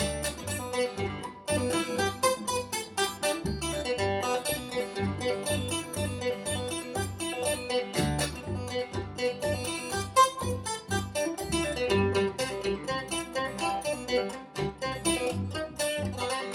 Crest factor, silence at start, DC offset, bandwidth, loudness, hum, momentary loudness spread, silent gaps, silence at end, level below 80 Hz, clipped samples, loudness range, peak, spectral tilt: 20 dB; 0 s; under 0.1%; 17.5 kHz; -30 LUFS; none; 6 LU; none; 0 s; -50 dBFS; under 0.1%; 3 LU; -10 dBFS; -4 dB/octave